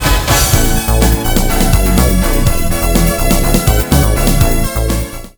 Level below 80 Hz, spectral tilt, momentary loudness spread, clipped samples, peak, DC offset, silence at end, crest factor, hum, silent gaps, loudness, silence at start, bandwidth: -14 dBFS; -4.5 dB/octave; 4 LU; under 0.1%; 0 dBFS; under 0.1%; 0.1 s; 10 dB; none; none; -12 LUFS; 0 s; over 20 kHz